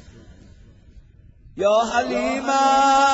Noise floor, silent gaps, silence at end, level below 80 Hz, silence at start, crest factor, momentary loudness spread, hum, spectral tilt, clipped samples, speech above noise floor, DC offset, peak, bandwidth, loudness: -48 dBFS; none; 0 s; -50 dBFS; 0.95 s; 16 dB; 7 LU; none; -3 dB/octave; under 0.1%; 30 dB; under 0.1%; -6 dBFS; 8 kHz; -19 LUFS